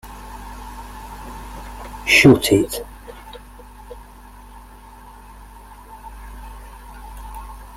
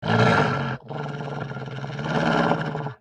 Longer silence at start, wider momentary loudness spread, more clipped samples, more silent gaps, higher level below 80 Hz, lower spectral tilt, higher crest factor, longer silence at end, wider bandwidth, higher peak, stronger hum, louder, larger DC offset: about the same, 0.05 s vs 0 s; first, 28 LU vs 13 LU; neither; neither; first, -38 dBFS vs -52 dBFS; second, -4.5 dB/octave vs -6.5 dB/octave; about the same, 24 dB vs 20 dB; about the same, 0.15 s vs 0.05 s; first, 16.5 kHz vs 9.8 kHz; first, 0 dBFS vs -4 dBFS; neither; first, -14 LUFS vs -24 LUFS; neither